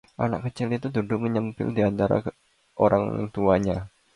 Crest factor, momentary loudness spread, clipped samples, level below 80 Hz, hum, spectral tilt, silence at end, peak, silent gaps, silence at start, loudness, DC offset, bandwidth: 20 dB; 7 LU; under 0.1%; -50 dBFS; none; -8.5 dB/octave; 0.3 s; -6 dBFS; none; 0.2 s; -25 LUFS; under 0.1%; 11 kHz